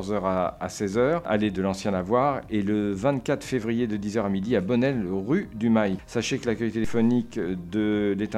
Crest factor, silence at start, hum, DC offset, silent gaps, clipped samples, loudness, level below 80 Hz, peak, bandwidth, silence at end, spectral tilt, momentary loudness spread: 18 dB; 0 s; none; under 0.1%; none; under 0.1%; -26 LUFS; -50 dBFS; -8 dBFS; 12.5 kHz; 0 s; -6.5 dB/octave; 5 LU